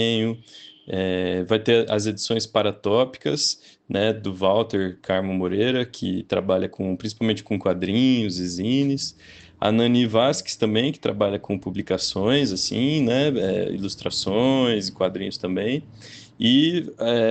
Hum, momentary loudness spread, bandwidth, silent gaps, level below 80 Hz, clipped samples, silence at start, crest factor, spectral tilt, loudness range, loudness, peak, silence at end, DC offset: none; 8 LU; 9 kHz; none; -58 dBFS; under 0.1%; 0 s; 18 dB; -5 dB/octave; 2 LU; -23 LUFS; -4 dBFS; 0 s; under 0.1%